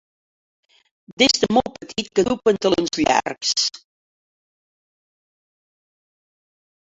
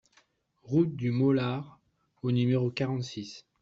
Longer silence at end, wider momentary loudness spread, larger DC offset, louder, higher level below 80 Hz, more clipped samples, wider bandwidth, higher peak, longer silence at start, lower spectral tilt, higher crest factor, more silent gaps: first, 3.15 s vs 0.2 s; second, 7 LU vs 13 LU; neither; first, -19 LUFS vs -29 LUFS; first, -54 dBFS vs -66 dBFS; neither; about the same, 8 kHz vs 7.6 kHz; first, -2 dBFS vs -14 dBFS; first, 1.1 s vs 0.65 s; second, -3 dB/octave vs -7.5 dB/octave; first, 22 dB vs 16 dB; first, 1.13-1.17 s vs none